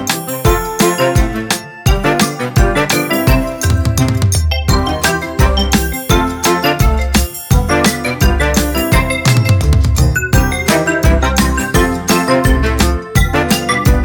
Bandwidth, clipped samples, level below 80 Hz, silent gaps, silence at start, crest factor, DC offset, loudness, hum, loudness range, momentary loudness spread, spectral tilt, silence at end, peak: 19 kHz; under 0.1%; -18 dBFS; none; 0 s; 12 dB; under 0.1%; -13 LUFS; none; 1 LU; 3 LU; -4.5 dB/octave; 0 s; 0 dBFS